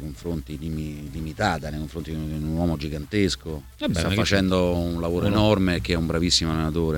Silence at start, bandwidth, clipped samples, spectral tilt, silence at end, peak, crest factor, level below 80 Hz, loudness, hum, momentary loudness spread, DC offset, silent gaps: 0 s; 18 kHz; under 0.1%; -5 dB/octave; 0 s; -6 dBFS; 18 dB; -36 dBFS; -24 LUFS; none; 12 LU; under 0.1%; none